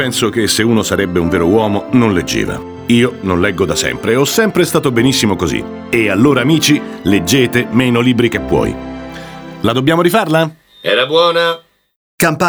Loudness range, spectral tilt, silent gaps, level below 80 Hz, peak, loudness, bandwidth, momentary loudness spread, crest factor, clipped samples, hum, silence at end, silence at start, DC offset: 2 LU; -4.5 dB/octave; 11.96-12.18 s; -38 dBFS; 0 dBFS; -13 LUFS; over 20 kHz; 9 LU; 14 dB; under 0.1%; none; 0 s; 0 s; under 0.1%